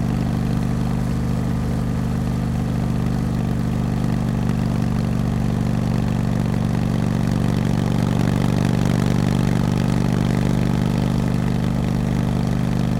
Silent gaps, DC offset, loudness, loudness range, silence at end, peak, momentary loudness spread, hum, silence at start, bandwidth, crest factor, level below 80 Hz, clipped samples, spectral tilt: none; under 0.1%; -21 LUFS; 3 LU; 0 s; -6 dBFS; 3 LU; none; 0 s; 16 kHz; 14 dB; -32 dBFS; under 0.1%; -7.5 dB/octave